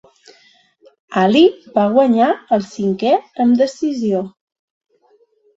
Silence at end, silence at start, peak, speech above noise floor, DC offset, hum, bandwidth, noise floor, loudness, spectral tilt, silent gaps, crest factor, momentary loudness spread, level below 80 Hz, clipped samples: 1.3 s; 1.1 s; -2 dBFS; 42 dB; under 0.1%; none; 7.8 kHz; -56 dBFS; -16 LUFS; -6.5 dB/octave; none; 16 dB; 8 LU; -60 dBFS; under 0.1%